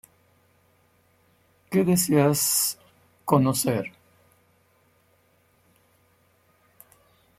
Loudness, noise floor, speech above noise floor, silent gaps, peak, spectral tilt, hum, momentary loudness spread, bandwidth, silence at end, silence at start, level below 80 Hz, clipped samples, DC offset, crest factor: -22 LUFS; -64 dBFS; 42 dB; none; -4 dBFS; -4.5 dB/octave; none; 15 LU; 16.5 kHz; 3.5 s; 1.7 s; -66 dBFS; under 0.1%; under 0.1%; 24 dB